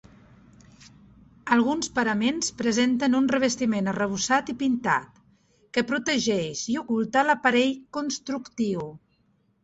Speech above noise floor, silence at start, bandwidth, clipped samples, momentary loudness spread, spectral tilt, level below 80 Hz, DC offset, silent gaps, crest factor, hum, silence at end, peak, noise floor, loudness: 42 dB; 1.45 s; 8.2 kHz; under 0.1%; 8 LU; -3.5 dB/octave; -62 dBFS; under 0.1%; none; 20 dB; none; 0.65 s; -6 dBFS; -67 dBFS; -25 LUFS